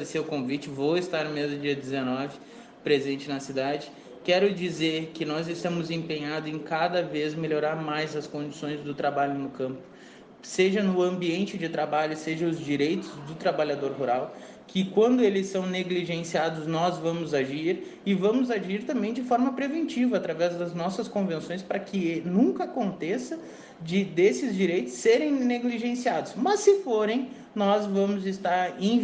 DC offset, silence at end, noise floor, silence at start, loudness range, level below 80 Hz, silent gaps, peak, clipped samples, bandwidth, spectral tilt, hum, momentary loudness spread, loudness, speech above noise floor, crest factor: under 0.1%; 0 s; -49 dBFS; 0 s; 4 LU; -70 dBFS; none; -8 dBFS; under 0.1%; 9.4 kHz; -5.5 dB/octave; none; 9 LU; -27 LUFS; 22 dB; 18 dB